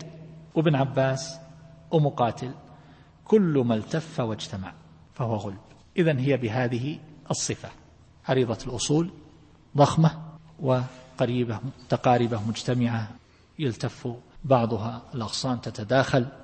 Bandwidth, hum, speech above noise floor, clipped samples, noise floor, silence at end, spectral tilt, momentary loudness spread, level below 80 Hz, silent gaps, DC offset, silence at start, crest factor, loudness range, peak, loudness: 8.8 kHz; none; 28 dB; under 0.1%; -53 dBFS; 0 s; -6 dB/octave; 15 LU; -56 dBFS; none; under 0.1%; 0 s; 20 dB; 3 LU; -6 dBFS; -26 LUFS